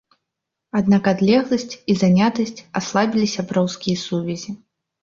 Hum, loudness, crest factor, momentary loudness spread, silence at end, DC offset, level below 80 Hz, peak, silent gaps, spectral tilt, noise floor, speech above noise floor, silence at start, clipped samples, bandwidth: none; -20 LUFS; 16 dB; 10 LU; 0.45 s; under 0.1%; -56 dBFS; -2 dBFS; none; -6 dB/octave; -81 dBFS; 63 dB; 0.75 s; under 0.1%; 7.6 kHz